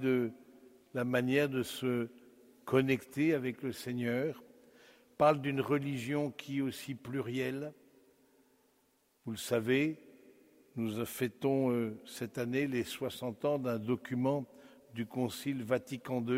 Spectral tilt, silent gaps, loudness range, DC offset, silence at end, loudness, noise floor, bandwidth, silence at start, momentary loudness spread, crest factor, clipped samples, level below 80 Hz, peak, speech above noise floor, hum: -6 dB/octave; none; 5 LU; under 0.1%; 0 s; -35 LUFS; -73 dBFS; 16 kHz; 0 s; 13 LU; 22 dB; under 0.1%; -74 dBFS; -14 dBFS; 39 dB; none